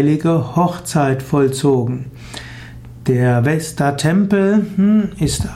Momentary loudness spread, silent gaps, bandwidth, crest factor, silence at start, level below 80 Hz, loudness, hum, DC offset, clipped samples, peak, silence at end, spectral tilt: 17 LU; none; 15.5 kHz; 12 dB; 0 s; -40 dBFS; -16 LUFS; none; under 0.1%; under 0.1%; -4 dBFS; 0 s; -6.5 dB/octave